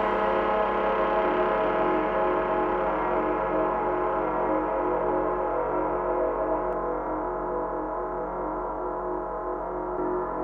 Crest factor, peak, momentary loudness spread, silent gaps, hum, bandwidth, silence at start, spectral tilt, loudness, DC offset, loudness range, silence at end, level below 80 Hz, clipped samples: 14 dB; -12 dBFS; 6 LU; none; 50 Hz at -70 dBFS; 5.8 kHz; 0 s; -8 dB/octave; -27 LUFS; under 0.1%; 5 LU; 0 s; -46 dBFS; under 0.1%